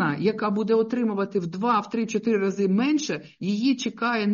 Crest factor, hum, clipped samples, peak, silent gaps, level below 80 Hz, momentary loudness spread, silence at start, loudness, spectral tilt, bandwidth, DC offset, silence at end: 14 dB; none; under 0.1%; -10 dBFS; none; -70 dBFS; 5 LU; 0 s; -24 LUFS; -5 dB/octave; 7.2 kHz; under 0.1%; 0 s